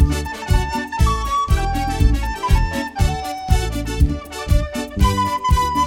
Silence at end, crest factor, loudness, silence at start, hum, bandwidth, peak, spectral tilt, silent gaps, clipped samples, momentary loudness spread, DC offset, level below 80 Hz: 0 s; 16 dB; -20 LUFS; 0 s; none; 17 kHz; -2 dBFS; -5.5 dB/octave; none; under 0.1%; 5 LU; under 0.1%; -20 dBFS